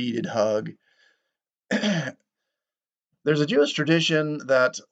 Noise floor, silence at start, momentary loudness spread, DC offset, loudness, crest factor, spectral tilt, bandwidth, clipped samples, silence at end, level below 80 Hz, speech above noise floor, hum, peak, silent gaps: under -90 dBFS; 0 s; 9 LU; under 0.1%; -23 LUFS; 18 dB; -5 dB/octave; 8.8 kHz; under 0.1%; 0.1 s; -80 dBFS; over 67 dB; none; -6 dBFS; none